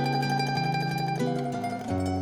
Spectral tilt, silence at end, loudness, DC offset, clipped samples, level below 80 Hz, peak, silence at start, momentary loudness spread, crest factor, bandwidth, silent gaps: -6 dB/octave; 0 s; -28 LUFS; under 0.1%; under 0.1%; -60 dBFS; -16 dBFS; 0 s; 4 LU; 12 dB; 16 kHz; none